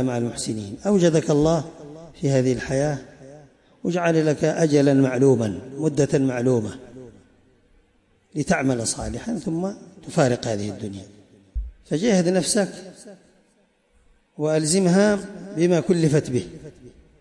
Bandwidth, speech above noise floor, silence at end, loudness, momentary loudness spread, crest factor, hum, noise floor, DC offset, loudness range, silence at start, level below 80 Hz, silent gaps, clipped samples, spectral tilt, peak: 11.5 kHz; 42 dB; 0.3 s; -22 LUFS; 17 LU; 16 dB; none; -63 dBFS; under 0.1%; 6 LU; 0 s; -46 dBFS; none; under 0.1%; -5.5 dB/octave; -6 dBFS